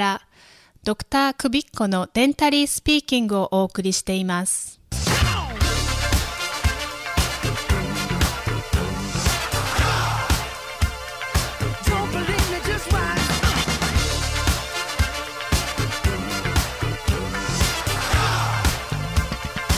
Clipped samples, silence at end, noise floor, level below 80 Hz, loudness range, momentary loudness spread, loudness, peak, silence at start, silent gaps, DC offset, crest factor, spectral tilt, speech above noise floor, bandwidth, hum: under 0.1%; 0 s; -52 dBFS; -28 dBFS; 3 LU; 6 LU; -22 LUFS; -6 dBFS; 0 s; none; under 0.1%; 16 dB; -4 dB/octave; 30 dB; 16 kHz; none